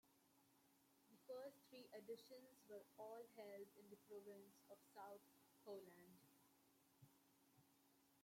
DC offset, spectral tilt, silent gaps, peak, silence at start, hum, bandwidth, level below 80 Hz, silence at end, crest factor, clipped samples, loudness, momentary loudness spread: under 0.1%; -4.5 dB/octave; none; -44 dBFS; 0.05 s; none; 16.5 kHz; under -90 dBFS; 0 s; 18 dB; under 0.1%; -62 LUFS; 9 LU